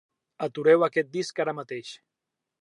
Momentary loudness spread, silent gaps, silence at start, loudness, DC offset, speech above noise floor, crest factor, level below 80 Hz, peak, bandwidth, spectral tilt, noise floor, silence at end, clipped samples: 16 LU; none; 0.4 s; -25 LUFS; under 0.1%; 61 dB; 20 dB; -82 dBFS; -8 dBFS; 10.5 kHz; -5 dB/octave; -86 dBFS; 0.65 s; under 0.1%